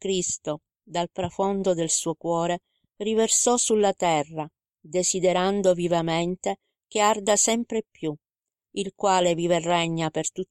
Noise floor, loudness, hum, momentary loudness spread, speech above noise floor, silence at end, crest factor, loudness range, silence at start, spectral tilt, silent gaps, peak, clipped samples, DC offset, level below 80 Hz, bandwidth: -90 dBFS; -24 LUFS; none; 13 LU; 66 dB; 0.05 s; 18 dB; 3 LU; 0 s; -3.5 dB/octave; none; -6 dBFS; under 0.1%; under 0.1%; -60 dBFS; 15.5 kHz